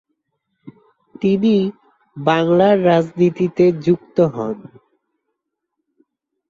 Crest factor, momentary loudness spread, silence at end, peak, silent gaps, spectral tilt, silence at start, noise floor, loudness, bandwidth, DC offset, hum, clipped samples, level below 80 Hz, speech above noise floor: 16 dB; 11 LU; 1.85 s; -2 dBFS; none; -8 dB/octave; 0.65 s; -77 dBFS; -17 LUFS; 7.2 kHz; under 0.1%; none; under 0.1%; -60 dBFS; 61 dB